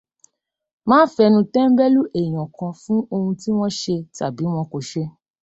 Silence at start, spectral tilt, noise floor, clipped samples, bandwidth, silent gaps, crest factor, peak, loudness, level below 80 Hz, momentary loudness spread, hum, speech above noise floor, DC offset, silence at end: 0.85 s; -6.5 dB/octave; -76 dBFS; under 0.1%; 8.2 kHz; none; 18 dB; -2 dBFS; -19 LUFS; -60 dBFS; 13 LU; none; 58 dB; under 0.1%; 0.3 s